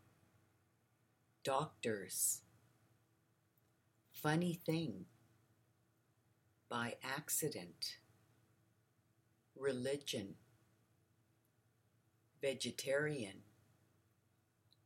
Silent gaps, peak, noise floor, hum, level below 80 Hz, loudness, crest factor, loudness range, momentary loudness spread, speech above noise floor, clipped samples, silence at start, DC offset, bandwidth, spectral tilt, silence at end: none; -22 dBFS; -78 dBFS; none; -88 dBFS; -42 LUFS; 24 dB; 5 LU; 12 LU; 37 dB; under 0.1%; 1.45 s; under 0.1%; 16.5 kHz; -3.5 dB/octave; 1.45 s